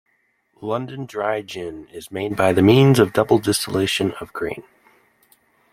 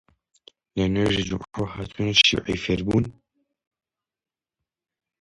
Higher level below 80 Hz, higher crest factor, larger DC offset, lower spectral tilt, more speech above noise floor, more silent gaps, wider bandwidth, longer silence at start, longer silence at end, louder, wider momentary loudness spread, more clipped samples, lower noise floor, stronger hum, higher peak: second, -54 dBFS vs -46 dBFS; about the same, 20 dB vs 24 dB; neither; about the same, -5.5 dB/octave vs -4.5 dB/octave; second, 47 dB vs over 67 dB; neither; first, 16 kHz vs 11.5 kHz; second, 0.6 s vs 0.75 s; second, 1.1 s vs 2.1 s; first, -19 LUFS vs -22 LUFS; first, 19 LU vs 15 LU; neither; second, -66 dBFS vs under -90 dBFS; neither; about the same, -2 dBFS vs -2 dBFS